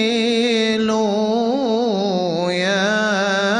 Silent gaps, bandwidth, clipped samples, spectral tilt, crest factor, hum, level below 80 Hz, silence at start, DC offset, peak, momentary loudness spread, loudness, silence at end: none; 10 kHz; under 0.1%; -4.5 dB/octave; 10 dB; none; -58 dBFS; 0 s; under 0.1%; -6 dBFS; 3 LU; -18 LUFS; 0 s